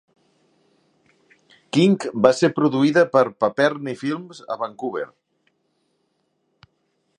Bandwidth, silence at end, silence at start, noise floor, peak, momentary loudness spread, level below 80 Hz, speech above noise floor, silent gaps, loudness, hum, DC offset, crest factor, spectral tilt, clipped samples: 10.5 kHz; 2.15 s; 1.75 s; -70 dBFS; 0 dBFS; 13 LU; -68 dBFS; 51 dB; none; -20 LUFS; none; under 0.1%; 22 dB; -6 dB/octave; under 0.1%